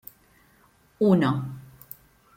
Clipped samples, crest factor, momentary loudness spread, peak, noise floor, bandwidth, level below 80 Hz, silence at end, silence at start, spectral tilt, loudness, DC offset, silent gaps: under 0.1%; 20 dB; 24 LU; -8 dBFS; -60 dBFS; 16.5 kHz; -62 dBFS; 0.75 s; 1 s; -8.5 dB/octave; -23 LUFS; under 0.1%; none